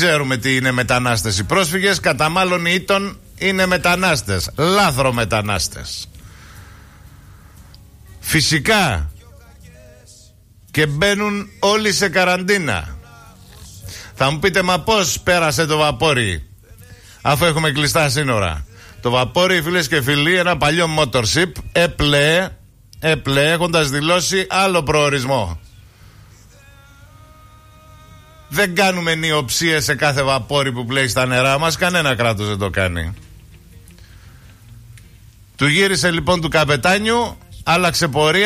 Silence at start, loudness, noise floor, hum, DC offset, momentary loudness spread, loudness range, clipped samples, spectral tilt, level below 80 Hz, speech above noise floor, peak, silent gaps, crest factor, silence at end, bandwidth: 0 s; -16 LUFS; -47 dBFS; none; under 0.1%; 9 LU; 6 LU; under 0.1%; -4 dB/octave; -38 dBFS; 30 dB; -4 dBFS; none; 14 dB; 0 s; 15.5 kHz